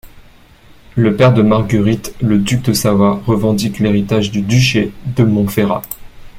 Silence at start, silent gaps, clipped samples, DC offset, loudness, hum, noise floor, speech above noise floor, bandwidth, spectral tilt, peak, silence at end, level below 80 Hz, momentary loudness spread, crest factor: 0.05 s; none; under 0.1%; under 0.1%; -14 LUFS; none; -42 dBFS; 30 dB; 16.5 kHz; -6 dB/octave; 0 dBFS; 0 s; -38 dBFS; 7 LU; 14 dB